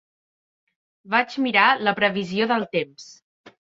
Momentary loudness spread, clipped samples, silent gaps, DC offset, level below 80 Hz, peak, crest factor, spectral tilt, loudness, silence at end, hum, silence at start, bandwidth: 10 LU; under 0.1%; 3.22-3.44 s; under 0.1%; -68 dBFS; -2 dBFS; 22 dB; -5 dB/octave; -21 LUFS; 0.1 s; none; 1.05 s; 7.8 kHz